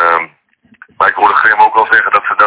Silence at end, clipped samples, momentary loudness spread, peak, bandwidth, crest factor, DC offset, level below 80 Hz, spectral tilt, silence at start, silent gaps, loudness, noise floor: 0 s; 2%; 6 LU; 0 dBFS; 4 kHz; 10 dB; under 0.1%; -54 dBFS; -5.5 dB/octave; 0 s; none; -9 LUFS; -50 dBFS